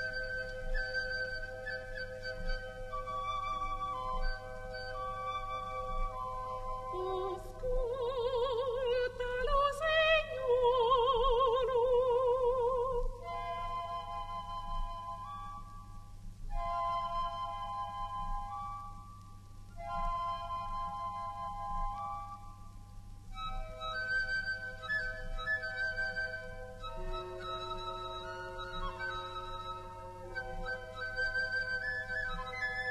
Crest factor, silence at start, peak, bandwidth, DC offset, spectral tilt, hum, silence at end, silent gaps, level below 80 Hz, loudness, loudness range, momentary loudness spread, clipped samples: 18 dB; 0 s; -18 dBFS; 12.5 kHz; under 0.1%; -4.5 dB/octave; none; 0 s; none; -44 dBFS; -36 LUFS; 11 LU; 15 LU; under 0.1%